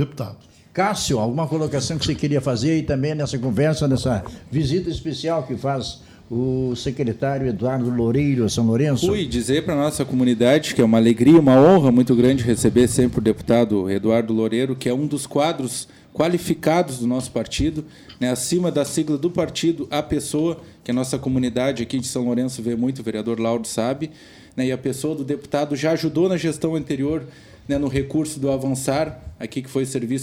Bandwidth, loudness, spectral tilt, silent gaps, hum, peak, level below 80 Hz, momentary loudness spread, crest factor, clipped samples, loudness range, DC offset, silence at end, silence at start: 16 kHz; -21 LUFS; -6 dB/octave; none; none; -4 dBFS; -44 dBFS; 10 LU; 16 dB; under 0.1%; 8 LU; under 0.1%; 0 s; 0 s